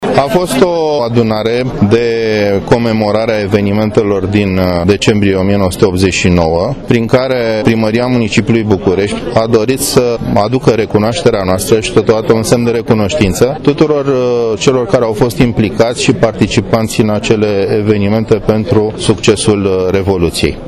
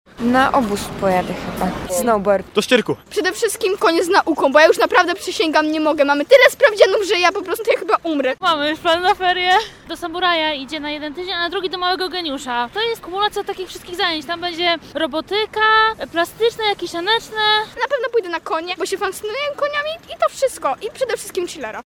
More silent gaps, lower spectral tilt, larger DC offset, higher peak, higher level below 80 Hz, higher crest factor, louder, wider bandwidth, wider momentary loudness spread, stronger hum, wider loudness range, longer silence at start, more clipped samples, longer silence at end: neither; first, -5.5 dB/octave vs -3 dB/octave; neither; about the same, 0 dBFS vs 0 dBFS; first, -32 dBFS vs -48 dBFS; second, 10 dB vs 18 dB; first, -11 LUFS vs -18 LUFS; second, 13.5 kHz vs 17.5 kHz; second, 3 LU vs 10 LU; neither; second, 1 LU vs 7 LU; second, 0 s vs 0.2 s; first, 0.5% vs under 0.1%; about the same, 0 s vs 0.05 s